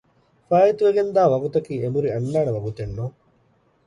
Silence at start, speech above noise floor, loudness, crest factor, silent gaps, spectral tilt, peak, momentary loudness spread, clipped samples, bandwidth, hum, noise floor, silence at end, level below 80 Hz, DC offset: 0.5 s; 41 dB; -21 LUFS; 16 dB; none; -8.5 dB/octave; -6 dBFS; 13 LU; under 0.1%; 10.5 kHz; none; -62 dBFS; 0.75 s; -52 dBFS; under 0.1%